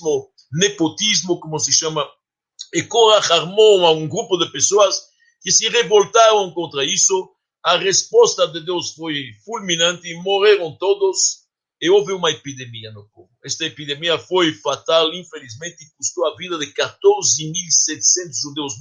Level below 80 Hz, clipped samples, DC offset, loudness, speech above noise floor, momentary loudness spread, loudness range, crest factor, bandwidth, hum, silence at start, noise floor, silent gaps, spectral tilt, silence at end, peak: -68 dBFS; under 0.1%; under 0.1%; -16 LUFS; 23 dB; 14 LU; 6 LU; 18 dB; 10.5 kHz; none; 0 s; -41 dBFS; none; -2 dB/octave; 0 s; 0 dBFS